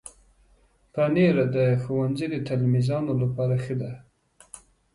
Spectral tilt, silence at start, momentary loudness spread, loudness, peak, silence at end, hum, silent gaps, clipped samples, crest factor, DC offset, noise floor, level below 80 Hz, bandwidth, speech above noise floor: -8 dB/octave; 0.05 s; 24 LU; -24 LUFS; -10 dBFS; 0.35 s; none; none; under 0.1%; 16 dB; under 0.1%; -61 dBFS; -56 dBFS; 11.5 kHz; 38 dB